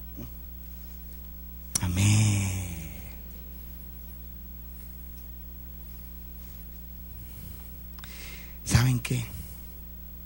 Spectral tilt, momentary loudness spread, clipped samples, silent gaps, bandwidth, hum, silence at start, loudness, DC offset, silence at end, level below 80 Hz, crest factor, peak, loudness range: -4.5 dB/octave; 17 LU; under 0.1%; none; 16.5 kHz; none; 0 s; -32 LUFS; under 0.1%; 0 s; -42 dBFS; 24 dB; -8 dBFS; 11 LU